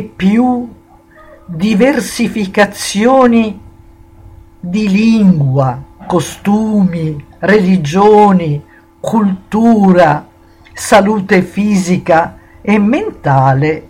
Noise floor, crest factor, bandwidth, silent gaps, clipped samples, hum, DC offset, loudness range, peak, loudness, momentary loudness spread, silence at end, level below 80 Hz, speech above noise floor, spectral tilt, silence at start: -41 dBFS; 12 dB; 15.5 kHz; none; under 0.1%; none; under 0.1%; 3 LU; 0 dBFS; -11 LUFS; 12 LU; 0.05 s; -42 dBFS; 31 dB; -6.5 dB/octave; 0 s